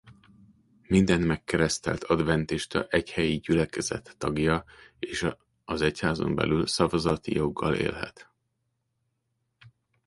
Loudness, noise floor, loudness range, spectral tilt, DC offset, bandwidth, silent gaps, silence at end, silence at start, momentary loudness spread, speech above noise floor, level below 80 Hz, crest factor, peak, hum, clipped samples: -27 LUFS; -78 dBFS; 3 LU; -5.5 dB/octave; under 0.1%; 11.5 kHz; none; 0.4 s; 0.05 s; 8 LU; 51 dB; -48 dBFS; 22 dB; -6 dBFS; none; under 0.1%